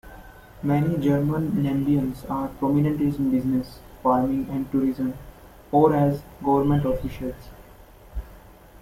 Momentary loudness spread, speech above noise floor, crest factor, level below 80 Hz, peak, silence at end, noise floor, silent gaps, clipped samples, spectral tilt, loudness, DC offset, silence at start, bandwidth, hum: 14 LU; 25 dB; 18 dB; -44 dBFS; -6 dBFS; 0.4 s; -48 dBFS; none; under 0.1%; -9 dB/octave; -24 LUFS; under 0.1%; 0.05 s; 16 kHz; none